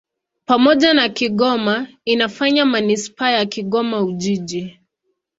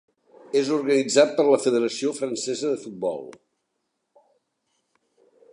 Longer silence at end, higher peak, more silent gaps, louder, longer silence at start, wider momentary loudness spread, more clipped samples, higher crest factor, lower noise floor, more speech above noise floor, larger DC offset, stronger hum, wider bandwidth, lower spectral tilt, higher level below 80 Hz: second, 0.7 s vs 2.2 s; first, 0 dBFS vs -4 dBFS; neither; first, -17 LUFS vs -23 LUFS; about the same, 0.5 s vs 0.55 s; about the same, 9 LU vs 11 LU; neither; about the same, 18 dB vs 22 dB; second, -72 dBFS vs -77 dBFS; about the same, 56 dB vs 55 dB; neither; neither; second, 8 kHz vs 11 kHz; about the same, -4.5 dB/octave vs -3.5 dB/octave; first, -60 dBFS vs -78 dBFS